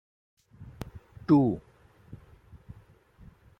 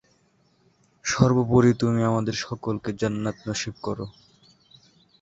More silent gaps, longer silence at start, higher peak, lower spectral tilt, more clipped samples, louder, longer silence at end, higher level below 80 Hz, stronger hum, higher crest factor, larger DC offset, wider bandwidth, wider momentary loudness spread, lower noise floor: neither; second, 0.6 s vs 1.05 s; second, -12 dBFS vs -4 dBFS; first, -10 dB/octave vs -6 dB/octave; neither; about the same, -25 LUFS vs -24 LUFS; about the same, 1.05 s vs 1.1 s; about the same, -56 dBFS vs -52 dBFS; neither; about the same, 20 dB vs 22 dB; neither; second, 6.6 kHz vs 8 kHz; first, 28 LU vs 13 LU; second, -57 dBFS vs -64 dBFS